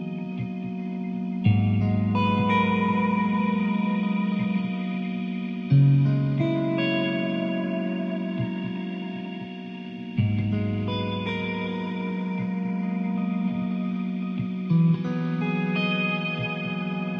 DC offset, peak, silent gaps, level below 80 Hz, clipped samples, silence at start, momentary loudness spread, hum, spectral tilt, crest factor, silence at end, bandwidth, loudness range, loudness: under 0.1%; -10 dBFS; none; -58 dBFS; under 0.1%; 0 s; 10 LU; none; -9 dB/octave; 14 dB; 0 s; 5.6 kHz; 5 LU; -26 LUFS